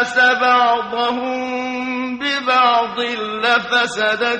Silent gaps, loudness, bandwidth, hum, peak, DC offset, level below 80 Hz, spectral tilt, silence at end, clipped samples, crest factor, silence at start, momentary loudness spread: none; -17 LUFS; 9.4 kHz; none; -2 dBFS; under 0.1%; -60 dBFS; -2.5 dB/octave; 0 s; under 0.1%; 14 dB; 0 s; 9 LU